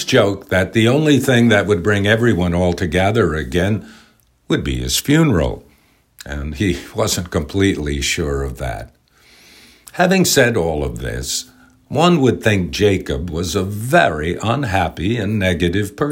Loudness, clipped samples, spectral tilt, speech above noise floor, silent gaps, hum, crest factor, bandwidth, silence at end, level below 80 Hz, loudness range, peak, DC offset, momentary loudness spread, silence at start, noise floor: -17 LUFS; under 0.1%; -5 dB/octave; 38 dB; none; none; 16 dB; 16.5 kHz; 0 s; -34 dBFS; 5 LU; 0 dBFS; under 0.1%; 10 LU; 0 s; -55 dBFS